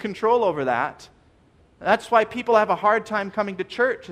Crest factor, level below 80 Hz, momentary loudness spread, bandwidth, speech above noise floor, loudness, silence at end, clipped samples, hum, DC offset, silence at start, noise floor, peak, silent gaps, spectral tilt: 18 dB; -60 dBFS; 8 LU; 11.5 kHz; 35 dB; -22 LUFS; 0 s; under 0.1%; none; under 0.1%; 0 s; -57 dBFS; -4 dBFS; none; -5 dB/octave